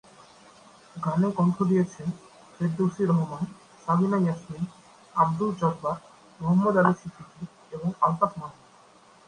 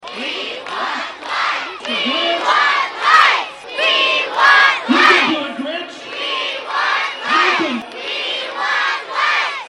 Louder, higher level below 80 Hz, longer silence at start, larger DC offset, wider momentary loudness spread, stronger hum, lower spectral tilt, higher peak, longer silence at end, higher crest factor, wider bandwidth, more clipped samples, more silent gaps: second, -26 LUFS vs -15 LUFS; about the same, -64 dBFS vs -66 dBFS; first, 0.95 s vs 0 s; neither; first, 17 LU vs 13 LU; neither; first, -8.5 dB/octave vs -1.5 dB/octave; second, -6 dBFS vs 0 dBFS; first, 0.75 s vs 0.05 s; first, 22 dB vs 16 dB; second, 10 kHz vs 12.5 kHz; neither; neither